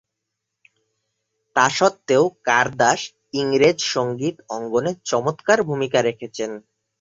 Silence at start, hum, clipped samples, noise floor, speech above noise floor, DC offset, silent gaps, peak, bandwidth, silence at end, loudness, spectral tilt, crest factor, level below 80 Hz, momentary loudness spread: 1.55 s; none; under 0.1%; -80 dBFS; 61 dB; under 0.1%; none; -2 dBFS; 7.8 kHz; 0.4 s; -20 LUFS; -4 dB/octave; 20 dB; -62 dBFS; 11 LU